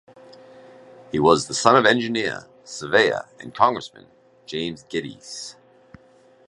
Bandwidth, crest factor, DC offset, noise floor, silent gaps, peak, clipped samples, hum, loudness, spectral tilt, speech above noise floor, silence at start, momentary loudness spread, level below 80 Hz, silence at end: 11.5 kHz; 24 dB; under 0.1%; -54 dBFS; none; 0 dBFS; under 0.1%; none; -20 LUFS; -3.5 dB/octave; 33 dB; 1.15 s; 19 LU; -58 dBFS; 0.95 s